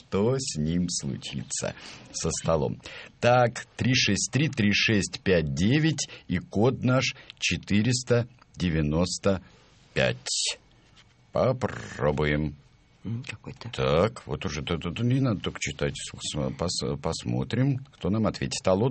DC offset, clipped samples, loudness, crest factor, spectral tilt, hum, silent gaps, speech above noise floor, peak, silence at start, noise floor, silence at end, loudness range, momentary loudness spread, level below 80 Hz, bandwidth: under 0.1%; under 0.1%; -27 LUFS; 22 dB; -4.5 dB/octave; none; none; 31 dB; -6 dBFS; 0.1 s; -57 dBFS; 0 s; 5 LU; 11 LU; -48 dBFS; 8.8 kHz